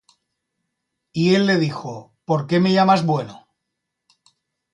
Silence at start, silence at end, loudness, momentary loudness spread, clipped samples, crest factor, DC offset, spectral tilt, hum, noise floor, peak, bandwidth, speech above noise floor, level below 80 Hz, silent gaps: 1.15 s; 1.35 s; -18 LUFS; 17 LU; under 0.1%; 18 dB; under 0.1%; -6.5 dB/octave; none; -79 dBFS; -4 dBFS; 10 kHz; 61 dB; -64 dBFS; none